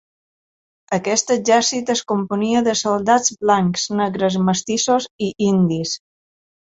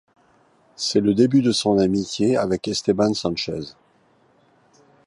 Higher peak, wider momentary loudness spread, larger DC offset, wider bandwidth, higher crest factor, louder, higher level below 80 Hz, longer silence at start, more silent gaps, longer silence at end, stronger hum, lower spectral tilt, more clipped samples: about the same, -2 dBFS vs -4 dBFS; second, 7 LU vs 10 LU; neither; second, 8 kHz vs 11.5 kHz; about the same, 18 dB vs 18 dB; about the same, -18 LUFS vs -20 LUFS; about the same, -58 dBFS vs -54 dBFS; about the same, 0.9 s vs 0.8 s; first, 5.11-5.19 s vs none; second, 0.8 s vs 1.35 s; neither; second, -4 dB/octave vs -5.5 dB/octave; neither